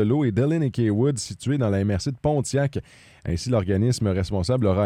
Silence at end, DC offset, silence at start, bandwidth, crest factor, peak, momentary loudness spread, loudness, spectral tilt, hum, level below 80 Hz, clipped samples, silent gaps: 0 s; under 0.1%; 0 s; 13 kHz; 14 dB; -10 dBFS; 7 LU; -23 LUFS; -6.5 dB/octave; none; -46 dBFS; under 0.1%; none